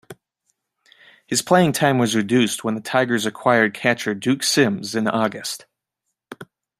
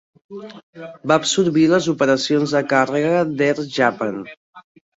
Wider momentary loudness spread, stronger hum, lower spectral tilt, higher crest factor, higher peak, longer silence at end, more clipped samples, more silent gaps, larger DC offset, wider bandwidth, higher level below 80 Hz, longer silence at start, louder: second, 12 LU vs 21 LU; neither; about the same, -4 dB/octave vs -4.5 dB/octave; about the same, 20 dB vs 18 dB; about the same, -2 dBFS vs -2 dBFS; about the same, 0.35 s vs 0.35 s; neither; second, none vs 0.63-0.73 s, 4.37-4.53 s; neither; first, 15.5 kHz vs 8 kHz; about the same, -64 dBFS vs -62 dBFS; second, 0.1 s vs 0.3 s; about the same, -19 LUFS vs -18 LUFS